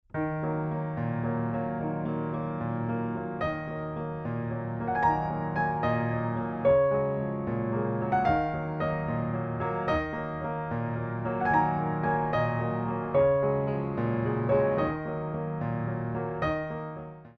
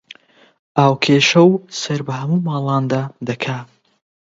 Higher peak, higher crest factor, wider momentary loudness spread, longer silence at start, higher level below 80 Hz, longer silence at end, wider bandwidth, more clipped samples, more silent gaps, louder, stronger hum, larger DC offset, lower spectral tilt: second, -12 dBFS vs 0 dBFS; about the same, 16 dB vs 18 dB; second, 8 LU vs 12 LU; second, 0.15 s vs 0.75 s; first, -50 dBFS vs -62 dBFS; second, 0.05 s vs 0.7 s; second, 6.2 kHz vs 7.8 kHz; neither; neither; second, -29 LUFS vs -17 LUFS; neither; neither; first, -10 dB/octave vs -5.5 dB/octave